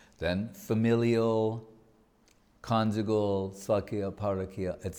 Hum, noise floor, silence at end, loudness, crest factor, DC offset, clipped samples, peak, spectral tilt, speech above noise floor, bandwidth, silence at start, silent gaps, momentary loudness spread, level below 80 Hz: none; -65 dBFS; 0 s; -30 LUFS; 16 dB; under 0.1%; under 0.1%; -14 dBFS; -7 dB/octave; 35 dB; over 20 kHz; 0.2 s; none; 9 LU; -58 dBFS